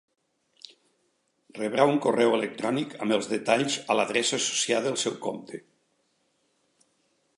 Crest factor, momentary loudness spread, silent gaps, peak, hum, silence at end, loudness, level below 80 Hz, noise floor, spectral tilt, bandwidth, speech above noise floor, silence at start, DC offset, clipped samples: 22 dB; 12 LU; none; -6 dBFS; none; 1.8 s; -26 LUFS; -80 dBFS; -72 dBFS; -3 dB/octave; 11.5 kHz; 46 dB; 1.55 s; under 0.1%; under 0.1%